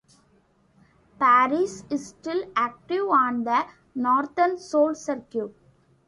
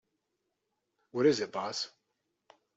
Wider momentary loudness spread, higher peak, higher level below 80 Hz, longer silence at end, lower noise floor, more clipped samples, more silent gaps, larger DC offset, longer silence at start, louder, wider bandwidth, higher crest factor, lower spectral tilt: about the same, 13 LU vs 13 LU; first, -8 dBFS vs -14 dBFS; first, -68 dBFS vs -82 dBFS; second, 0.6 s vs 0.9 s; second, -62 dBFS vs -83 dBFS; neither; neither; neither; about the same, 1.2 s vs 1.15 s; first, -24 LUFS vs -32 LUFS; first, 11.5 kHz vs 8 kHz; second, 16 dB vs 22 dB; about the same, -4.5 dB/octave vs -4.5 dB/octave